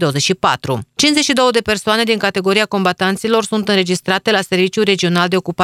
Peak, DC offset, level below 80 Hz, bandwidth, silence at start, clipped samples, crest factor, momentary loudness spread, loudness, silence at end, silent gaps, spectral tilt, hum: 0 dBFS; under 0.1%; -52 dBFS; 15.5 kHz; 0 s; under 0.1%; 14 dB; 4 LU; -15 LUFS; 0 s; none; -4 dB/octave; none